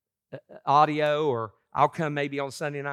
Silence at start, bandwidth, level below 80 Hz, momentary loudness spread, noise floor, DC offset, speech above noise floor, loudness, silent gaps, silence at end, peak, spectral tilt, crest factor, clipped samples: 0.3 s; 14.5 kHz; -72 dBFS; 19 LU; -46 dBFS; under 0.1%; 22 dB; -26 LUFS; none; 0 s; -8 dBFS; -6 dB/octave; 20 dB; under 0.1%